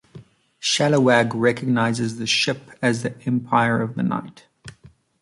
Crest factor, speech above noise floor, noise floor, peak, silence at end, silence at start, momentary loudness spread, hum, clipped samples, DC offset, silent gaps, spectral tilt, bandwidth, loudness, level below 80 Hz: 18 dB; 31 dB; -51 dBFS; -4 dBFS; 0.5 s; 0.15 s; 8 LU; none; under 0.1%; under 0.1%; none; -4.5 dB/octave; 11.5 kHz; -21 LUFS; -60 dBFS